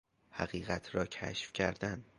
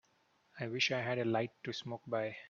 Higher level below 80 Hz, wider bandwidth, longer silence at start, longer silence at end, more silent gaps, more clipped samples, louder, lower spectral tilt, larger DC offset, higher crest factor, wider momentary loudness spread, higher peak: first, -58 dBFS vs -80 dBFS; first, 11 kHz vs 7.4 kHz; second, 0.3 s vs 0.55 s; first, 0.15 s vs 0 s; neither; neither; about the same, -38 LUFS vs -37 LUFS; about the same, -5 dB/octave vs -4.5 dB/octave; neither; about the same, 24 dB vs 20 dB; second, 6 LU vs 10 LU; about the same, -16 dBFS vs -18 dBFS